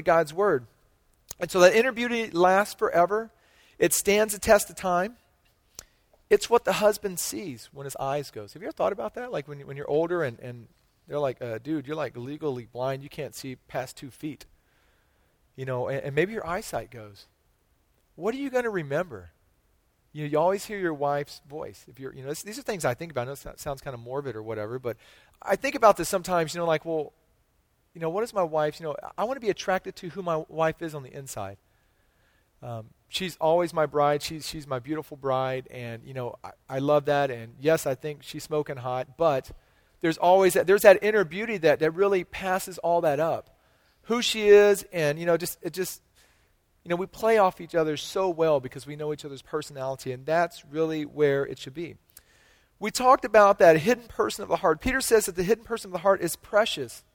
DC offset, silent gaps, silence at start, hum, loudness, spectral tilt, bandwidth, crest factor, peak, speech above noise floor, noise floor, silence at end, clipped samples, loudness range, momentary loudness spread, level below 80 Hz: under 0.1%; none; 0 s; none; -26 LUFS; -4.5 dB/octave; 18.5 kHz; 24 dB; -2 dBFS; 43 dB; -68 dBFS; 0.15 s; under 0.1%; 11 LU; 17 LU; -56 dBFS